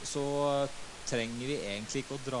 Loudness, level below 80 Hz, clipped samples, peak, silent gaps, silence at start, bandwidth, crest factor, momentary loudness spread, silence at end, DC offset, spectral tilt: -34 LUFS; -56 dBFS; under 0.1%; -18 dBFS; none; 0 s; 11.5 kHz; 16 dB; 7 LU; 0 s; under 0.1%; -4 dB/octave